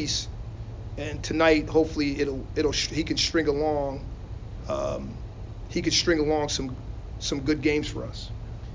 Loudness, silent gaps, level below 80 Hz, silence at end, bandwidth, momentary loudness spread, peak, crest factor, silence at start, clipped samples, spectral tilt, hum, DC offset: -26 LUFS; none; -38 dBFS; 0 s; 7.6 kHz; 17 LU; -8 dBFS; 18 dB; 0 s; under 0.1%; -4 dB/octave; none; under 0.1%